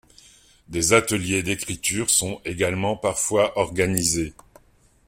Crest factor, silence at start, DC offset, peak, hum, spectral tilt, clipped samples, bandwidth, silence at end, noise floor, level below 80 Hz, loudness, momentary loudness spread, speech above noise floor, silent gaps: 22 dB; 0.7 s; under 0.1%; -2 dBFS; none; -3 dB/octave; under 0.1%; 16.5 kHz; 0.75 s; -58 dBFS; -48 dBFS; -22 LUFS; 8 LU; 35 dB; none